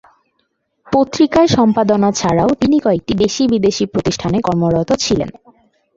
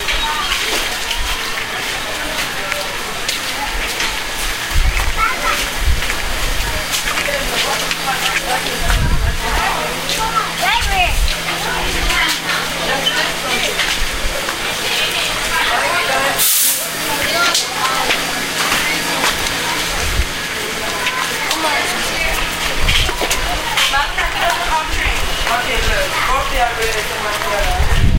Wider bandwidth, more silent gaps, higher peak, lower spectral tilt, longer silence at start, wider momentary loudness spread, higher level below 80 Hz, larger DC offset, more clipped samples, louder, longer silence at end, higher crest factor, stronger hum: second, 7.8 kHz vs 17 kHz; neither; about the same, 0 dBFS vs 0 dBFS; first, -5.5 dB/octave vs -2 dB/octave; first, 0.9 s vs 0 s; about the same, 6 LU vs 5 LU; second, -42 dBFS vs -24 dBFS; neither; neither; about the same, -14 LUFS vs -16 LUFS; first, 0.65 s vs 0 s; about the same, 14 dB vs 16 dB; neither